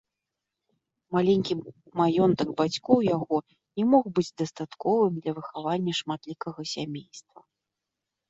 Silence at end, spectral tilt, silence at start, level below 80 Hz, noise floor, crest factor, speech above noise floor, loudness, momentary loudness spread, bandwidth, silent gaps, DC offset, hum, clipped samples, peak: 1.1 s; -6.5 dB/octave; 1.1 s; -66 dBFS; -86 dBFS; 22 dB; 60 dB; -27 LUFS; 12 LU; 8 kHz; none; under 0.1%; none; under 0.1%; -6 dBFS